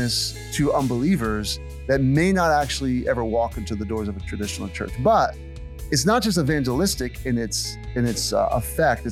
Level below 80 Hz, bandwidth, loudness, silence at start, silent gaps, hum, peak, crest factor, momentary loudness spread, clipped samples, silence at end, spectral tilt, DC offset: -36 dBFS; 16 kHz; -23 LUFS; 0 s; none; none; -6 dBFS; 16 dB; 10 LU; under 0.1%; 0 s; -5 dB/octave; under 0.1%